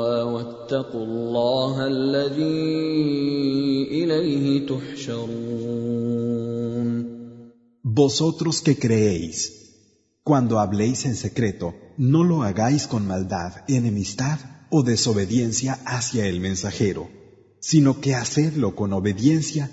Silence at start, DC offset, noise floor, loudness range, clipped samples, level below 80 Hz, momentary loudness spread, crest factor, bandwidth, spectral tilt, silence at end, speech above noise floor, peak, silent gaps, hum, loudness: 0 s; under 0.1%; -61 dBFS; 2 LU; under 0.1%; -54 dBFS; 10 LU; 18 dB; 8 kHz; -5.5 dB/octave; 0 s; 39 dB; -4 dBFS; none; none; -23 LUFS